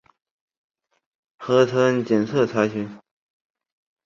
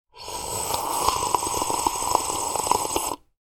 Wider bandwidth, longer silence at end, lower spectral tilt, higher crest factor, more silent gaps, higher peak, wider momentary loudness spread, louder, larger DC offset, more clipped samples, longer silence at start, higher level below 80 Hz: second, 7.6 kHz vs 19 kHz; first, 1.1 s vs 0.25 s; first, -6.5 dB/octave vs -1.5 dB/octave; about the same, 20 dB vs 24 dB; neither; about the same, -4 dBFS vs -2 dBFS; first, 14 LU vs 7 LU; first, -21 LUFS vs -24 LUFS; neither; neither; first, 1.4 s vs 0.15 s; second, -64 dBFS vs -48 dBFS